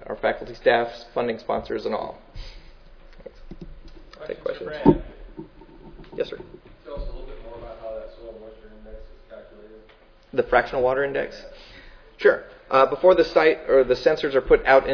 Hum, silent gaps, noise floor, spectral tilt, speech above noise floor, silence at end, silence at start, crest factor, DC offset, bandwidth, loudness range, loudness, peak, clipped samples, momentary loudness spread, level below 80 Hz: none; none; -52 dBFS; -7 dB/octave; 32 dB; 0 s; 0 s; 24 dB; under 0.1%; 5.4 kHz; 17 LU; -22 LUFS; 0 dBFS; under 0.1%; 25 LU; -42 dBFS